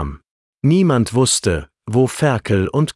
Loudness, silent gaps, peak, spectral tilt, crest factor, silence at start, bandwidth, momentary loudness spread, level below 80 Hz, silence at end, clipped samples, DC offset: -17 LUFS; 0.31-0.58 s; -4 dBFS; -5.5 dB/octave; 14 dB; 0 s; 12 kHz; 7 LU; -40 dBFS; 0.05 s; under 0.1%; under 0.1%